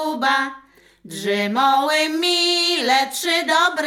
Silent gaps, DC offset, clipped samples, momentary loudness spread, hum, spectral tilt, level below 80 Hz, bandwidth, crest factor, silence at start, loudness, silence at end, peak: none; under 0.1%; under 0.1%; 7 LU; none; -2 dB/octave; -68 dBFS; 18 kHz; 14 dB; 0 s; -18 LUFS; 0 s; -6 dBFS